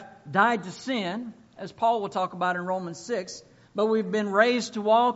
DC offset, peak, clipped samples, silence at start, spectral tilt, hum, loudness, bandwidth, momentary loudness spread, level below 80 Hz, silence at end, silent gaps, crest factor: under 0.1%; -6 dBFS; under 0.1%; 0 s; -3 dB/octave; none; -26 LUFS; 8 kHz; 16 LU; -72 dBFS; 0 s; none; 20 dB